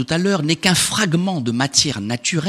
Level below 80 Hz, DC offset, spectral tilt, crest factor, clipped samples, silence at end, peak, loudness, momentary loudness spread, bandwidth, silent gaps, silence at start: -50 dBFS; under 0.1%; -3.5 dB/octave; 18 dB; under 0.1%; 0 s; 0 dBFS; -17 LUFS; 5 LU; 14.5 kHz; none; 0 s